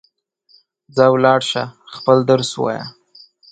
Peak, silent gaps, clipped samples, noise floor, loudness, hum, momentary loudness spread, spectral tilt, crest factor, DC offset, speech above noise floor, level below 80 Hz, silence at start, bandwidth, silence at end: 0 dBFS; none; under 0.1%; -59 dBFS; -16 LUFS; none; 14 LU; -5.5 dB/octave; 18 dB; under 0.1%; 43 dB; -60 dBFS; 0.95 s; 9.2 kHz; 0.6 s